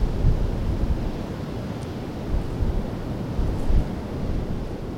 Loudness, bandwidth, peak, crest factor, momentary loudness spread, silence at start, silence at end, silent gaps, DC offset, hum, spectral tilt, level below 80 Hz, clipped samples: -28 LUFS; 11 kHz; -8 dBFS; 16 dB; 7 LU; 0 s; 0 s; none; under 0.1%; none; -8 dB/octave; -26 dBFS; under 0.1%